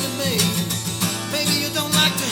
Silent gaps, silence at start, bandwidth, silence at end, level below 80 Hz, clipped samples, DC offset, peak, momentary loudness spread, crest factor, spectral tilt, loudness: none; 0 s; 19.5 kHz; 0 s; -52 dBFS; under 0.1%; under 0.1%; -4 dBFS; 6 LU; 18 dB; -3 dB/octave; -20 LUFS